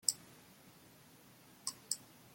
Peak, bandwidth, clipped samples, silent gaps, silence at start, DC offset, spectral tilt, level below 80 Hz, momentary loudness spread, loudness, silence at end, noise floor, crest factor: -12 dBFS; 16.5 kHz; under 0.1%; none; 0.05 s; under 0.1%; 0.5 dB/octave; -84 dBFS; 20 LU; -42 LUFS; 0 s; -62 dBFS; 34 dB